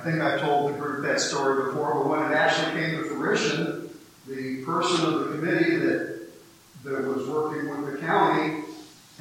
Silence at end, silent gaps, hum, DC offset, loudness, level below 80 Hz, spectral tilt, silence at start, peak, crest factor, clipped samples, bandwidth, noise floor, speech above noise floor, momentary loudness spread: 0.25 s; none; none; under 0.1%; -25 LUFS; -70 dBFS; -4.5 dB/octave; 0 s; -8 dBFS; 18 dB; under 0.1%; 16.5 kHz; -50 dBFS; 25 dB; 13 LU